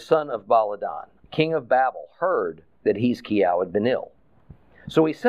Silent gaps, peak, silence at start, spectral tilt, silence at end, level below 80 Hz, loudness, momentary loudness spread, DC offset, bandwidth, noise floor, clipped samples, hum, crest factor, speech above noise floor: none; -6 dBFS; 0 s; -7 dB/octave; 0 s; -62 dBFS; -23 LUFS; 11 LU; 0.1%; 10 kHz; -51 dBFS; under 0.1%; none; 18 dB; 29 dB